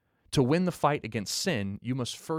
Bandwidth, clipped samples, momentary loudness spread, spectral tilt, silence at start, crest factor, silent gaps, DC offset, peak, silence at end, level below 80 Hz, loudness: 16 kHz; under 0.1%; 7 LU; -5 dB/octave; 0.3 s; 18 dB; none; under 0.1%; -10 dBFS; 0 s; -56 dBFS; -29 LUFS